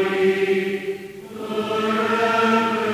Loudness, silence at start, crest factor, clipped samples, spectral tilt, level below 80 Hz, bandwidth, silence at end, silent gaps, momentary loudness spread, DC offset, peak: -21 LUFS; 0 s; 14 dB; under 0.1%; -5 dB/octave; -62 dBFS; 16 kHz; 0 s; none; 14 LU; under 0.1%; -6 dBFS